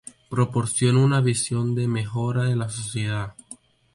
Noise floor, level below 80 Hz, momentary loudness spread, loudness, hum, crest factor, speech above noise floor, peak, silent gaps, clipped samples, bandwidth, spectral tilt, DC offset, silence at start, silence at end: -47 dBFS; -54 dBFS; 14 LU; -23 LUFS; none; 14 dB; 25 dB; -8 dBFS; none; under 0.1%; 11.5 kHz; -5.5 dB/octave; under 0.1%; 0.3 s; 0.4 s